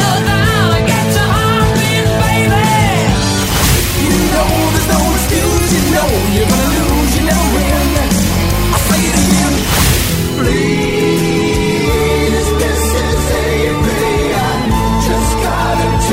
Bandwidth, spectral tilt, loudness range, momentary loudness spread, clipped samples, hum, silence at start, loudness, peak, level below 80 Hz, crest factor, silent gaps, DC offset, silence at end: 16.5 kHz; -4.5 dB/octave; 2 LU; 3 LU; under 0.1%; none; 0 s; -12 LUFS; 0 dBFS; -20 dBFS; 12 dB; none; under 0.1%; 0 s